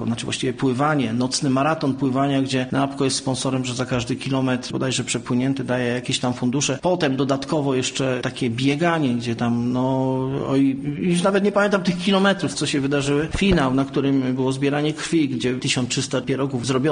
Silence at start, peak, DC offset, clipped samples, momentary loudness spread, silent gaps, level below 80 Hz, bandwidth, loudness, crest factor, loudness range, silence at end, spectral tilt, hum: 0 s; -6 dBFS; under 0.1%; under 0.1%; 5 LU; none; -46 dBFS; 10 kHz; -21 LUFS; 16 dB; 3 LU; 0 s; -5 dB/octave; none